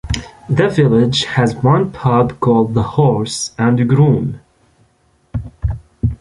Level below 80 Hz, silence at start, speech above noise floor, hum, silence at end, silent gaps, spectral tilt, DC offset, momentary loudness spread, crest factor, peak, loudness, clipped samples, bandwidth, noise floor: -32 dBFS; 0.05 s; 43 dB; none; 0.05 s; none; -6.5 dB/octave; under 0.1%; 12 LU; 14 dB; -2 dBFS; -15 LUFS; under 0.1%; 11.5 kHz; -57 dBFS